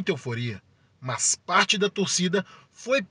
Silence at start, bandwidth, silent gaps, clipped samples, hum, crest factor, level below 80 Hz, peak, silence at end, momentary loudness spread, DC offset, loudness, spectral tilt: 0 s; 11 kHz; none; under 0.1%; none; 20 dB; -70 dBFS; -6 dBFS; 0.05 s; 19 LU; under 0.1%; -24 LUFS; -3 dB/octave